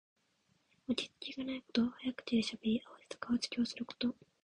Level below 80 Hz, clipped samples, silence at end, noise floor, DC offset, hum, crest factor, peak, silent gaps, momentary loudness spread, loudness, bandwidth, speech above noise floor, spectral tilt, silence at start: -72 dBFS; under 0.1%; 0.35 s; -76 dBFS; under 0.1%; none; 20 dB; -18 dBFS; none; 8 LU; -38 LUFS; 10.5 kHz; 39 dB; -4.5 dB/octave; 0.9 s